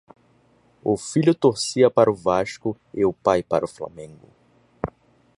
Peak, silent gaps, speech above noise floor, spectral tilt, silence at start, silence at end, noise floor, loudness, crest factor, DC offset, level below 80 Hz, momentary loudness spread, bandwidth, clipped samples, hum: -2 dBFS; none; 38 dB; -5.5 dB/octave; 0.85 s; 0.55 s; -59 dBFS; -21 LUFS; 20 dB; under 0.1%; -54 dBFS; 16 LU; 11.5 kHz; under 0.1%; none